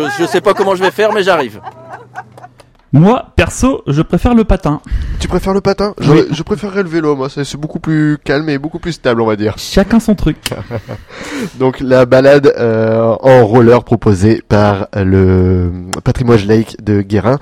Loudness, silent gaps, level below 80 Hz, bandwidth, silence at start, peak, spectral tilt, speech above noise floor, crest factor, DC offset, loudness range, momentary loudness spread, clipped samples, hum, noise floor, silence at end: -11 LUFS; none; -28 dBFS; 16 kHz; 0 s; 0 dBFS; -7 dB/octave; 28 dB; 12 dB; under 0.1%; 6 LU; 13 LU; 0.5%; none; -39 dBFS; 0.05 s